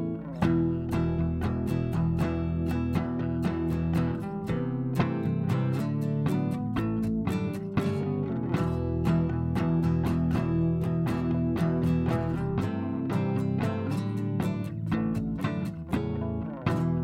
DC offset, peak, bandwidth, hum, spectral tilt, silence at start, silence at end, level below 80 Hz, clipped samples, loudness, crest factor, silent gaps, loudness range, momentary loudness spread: under 0.1%; -12 dBFS; 14 kHz; none; -9 dB/octave; 0 s; 0 s; -46 dBFS; under 0.1%; -29 LUFS; 16 dB; none; 3 LU; 4 LU